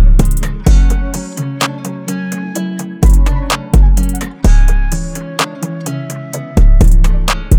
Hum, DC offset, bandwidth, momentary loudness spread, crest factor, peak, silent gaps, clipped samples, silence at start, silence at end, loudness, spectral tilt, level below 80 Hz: none; under 0.1%; 16.5 kHz; 11 LU; 10 dB; 0 dBFS; none; under 0.1%; 0 s; 0 s; -15 LUFS; -5.5 dB/octave; -10 dBFS